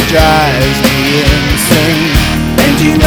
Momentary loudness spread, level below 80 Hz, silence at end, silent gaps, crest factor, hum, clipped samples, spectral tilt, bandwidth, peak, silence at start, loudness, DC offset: 3 LU; -18 dBFS; 0 s; none; 8 dB; none; 2%; -4.5 dB/octave; over 20 kHz; 0 dBFS; 0 s; -9 LUFS; under 0.1%